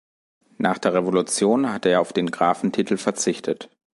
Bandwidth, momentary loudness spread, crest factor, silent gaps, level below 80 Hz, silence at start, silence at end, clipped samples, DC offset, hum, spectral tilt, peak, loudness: 11.5 kHz; 5 LU; 18 dB; none; -64 dBFS; 0.6 s; 0.3 s; under 0.1%; under 0.1%; none; -4.5 dB/octave; -4 dBFS; -22 LUFS